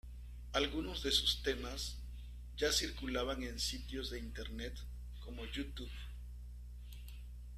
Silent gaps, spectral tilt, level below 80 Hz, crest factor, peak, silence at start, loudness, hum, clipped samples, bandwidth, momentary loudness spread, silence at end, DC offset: none; -3 dB/octave; -48 dBFS; 22 dB; -18 dBFS; 0.05 s; -39 LUFS; 60 Hz at -45 dBFS; under 0.1%; 14.5 kHz; 18 LU; 0 s; under 0.1%